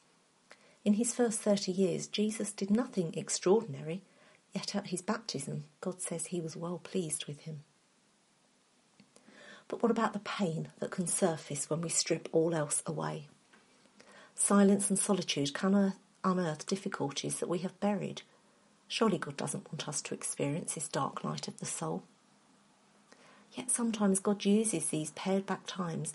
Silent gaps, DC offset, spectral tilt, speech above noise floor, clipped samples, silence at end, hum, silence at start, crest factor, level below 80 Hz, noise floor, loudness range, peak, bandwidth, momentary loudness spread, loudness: none; under 0.1%; -4.5 dB/octave; 36 dB; under 0.1%; 0 s; none; 0.5 s; 20 dB; -78 dBFS; -69 dBFS; 8 LU; -14 dBFS; 11.5 kHz; 11 LU; -33 LUFS